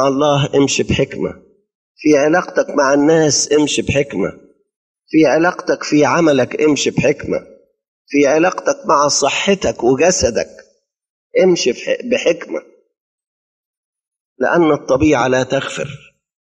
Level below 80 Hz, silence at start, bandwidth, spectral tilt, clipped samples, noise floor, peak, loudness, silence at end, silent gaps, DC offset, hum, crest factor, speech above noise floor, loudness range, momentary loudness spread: -44 dBFS; 0 s; 10 kHz; -4 dB/octave; under 0.1%; -55 dBFS; -2 dBFS; -15 LUFS; 0.6 s; 1.75-1.95 s, 4.76-4.94 s, 7.88-8.05 s, 11.10-11.30 s, 13.00-13.18 s, 13.27-13.93 s, 14.20-14.36 s; under 0.1%; none; 14 dB; 41 dB; 4 LU; 10 LU